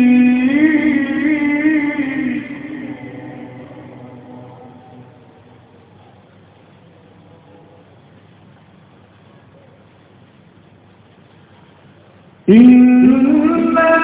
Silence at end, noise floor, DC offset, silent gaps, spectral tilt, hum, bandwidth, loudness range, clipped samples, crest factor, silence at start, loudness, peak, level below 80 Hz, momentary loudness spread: 0 s; -46 dBFS; under 0.1%; none; -10.5 dB/octave; none; 4 kHz; 25 LU; under 0.1%; 16 dB; 0 s; -12 LUFS; 0 dBFS; -52 dBFS; 28 LU